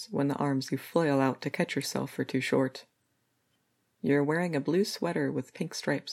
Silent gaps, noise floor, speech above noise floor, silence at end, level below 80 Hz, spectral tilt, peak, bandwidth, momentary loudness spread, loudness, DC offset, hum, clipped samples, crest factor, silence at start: none; -75 dBFS; 46 dB; 0 s; -76 dBFS; -5.5 dB/octave; -12 dBFS; 16 kHz; 7 LU; -30 LUFS; under 0.1%; none; under 0.1%; 20 dB; 0 s